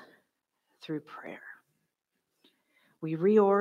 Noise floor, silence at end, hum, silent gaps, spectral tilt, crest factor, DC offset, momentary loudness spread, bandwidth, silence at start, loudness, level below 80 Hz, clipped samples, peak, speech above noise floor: -83 dBFS; 0 s; none; none; -9 dB/octave; 20 dB; under 0.1%; 25 LU; 7 kHz; 0.85 s; -29 LUFS; -88 dBFS; under 0.1%; -12 dBFS; 55 dB